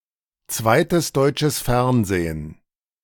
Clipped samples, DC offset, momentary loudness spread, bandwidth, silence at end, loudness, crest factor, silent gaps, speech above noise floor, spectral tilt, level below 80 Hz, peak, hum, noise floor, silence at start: under 0.1%; under 0.1%; 11 LU; 19.5 kHz; 0.5 s; -20 LUFS; 18 dB; none; 34 dB; -5 dB/octave; -40 dBFS; -4 dBFS; none; -54 dBFS; 0.5 s